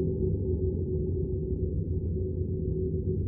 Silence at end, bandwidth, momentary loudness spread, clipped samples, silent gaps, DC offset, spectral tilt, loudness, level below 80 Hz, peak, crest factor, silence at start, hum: 0 s; 0.9 kHz; 2 LU; under 0.1%; none; under 0.1%; -15 dB/octave; -31 LUFS; -36 dBFS; -16 dBFS; 12 dB; 0 s; none